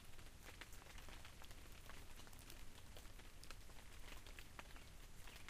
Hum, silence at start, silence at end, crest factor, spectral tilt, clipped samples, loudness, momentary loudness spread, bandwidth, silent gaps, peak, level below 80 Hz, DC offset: none; 0 s; 0 s; 20 dB; -3 dB/octave; under 0.1%; -60 LUFS; 3 LU; 15.5 kHz; none; -34 dBFS; -60 dBFS; under 0.1%